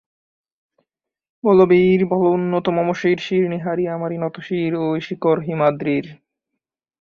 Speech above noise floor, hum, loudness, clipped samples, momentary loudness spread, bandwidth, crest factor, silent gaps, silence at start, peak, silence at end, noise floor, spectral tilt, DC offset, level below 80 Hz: 64 dB; none; -19 LUFS; under 0.1%; 10 LU; 6.8 kHz; 16 dB; none; 1.45 s; -4 dBFS; 0.9 s; -82 dBFS; -8 dB/octave; under 0.1%; -60 dBFS